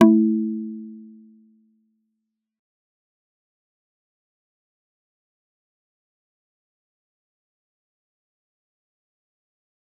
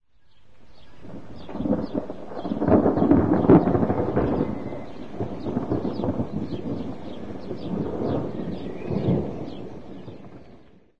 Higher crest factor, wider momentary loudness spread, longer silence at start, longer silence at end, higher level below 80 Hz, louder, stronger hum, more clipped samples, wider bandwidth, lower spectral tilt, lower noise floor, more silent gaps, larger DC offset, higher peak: about the same, 28 dB vs 24 dB; first, 24 LU vs 21 LU; about the same, 0 s vs 0 s; first, 9 s vs 0 s; second, -80 dBFS vs -44 dBFS; first, -21 LUFS vs -24 LUFS; neither; neither; second, 3.5 kHz vs 6.6 kHz; second, -7.5 dB/octave vs -10 dB/octave; first, -80 dBFS vs -53 dBFS; neither; second, under 0.1% vs 2%; about the same, -2 dBFS vs -2 dBFS